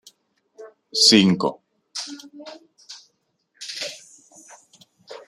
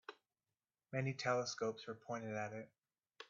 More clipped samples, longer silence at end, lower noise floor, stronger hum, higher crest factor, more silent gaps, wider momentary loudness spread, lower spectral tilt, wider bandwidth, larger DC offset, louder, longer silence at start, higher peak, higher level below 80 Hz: neither; about the same, 0.1 s vs 0.05 s; second, -70 dBFS vs under -90 dBFS; neither; about the same, 24 dB vs 22 dB; neither; first, 29 LU vs 14 LU; about the same, -3.5 dB/octave vs -4 dB/octave; first, 13.5 kHz vs 7.4 kHz; neither; first, -19 LUFS vs -43 LUFS; first, 0.6 s vs 0.1 s; first, -2 dBFS vs -24 dBFS; first, -66 dBFS vs -84 dBFS